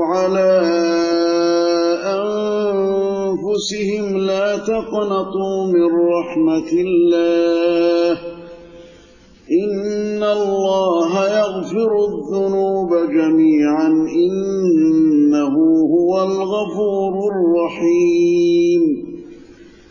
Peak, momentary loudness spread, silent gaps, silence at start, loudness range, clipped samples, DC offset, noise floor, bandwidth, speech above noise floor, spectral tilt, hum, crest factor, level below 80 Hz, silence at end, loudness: -6 dBFS; 6 LU; none; 0 s; 4 LU; under 0.1%; under 0.1%; -46 dBFS; 7.4 kHz; 30 dB; -6 dB/octave; none; 10 dB; -54 dBFS; 0.25 s; -16 LUFS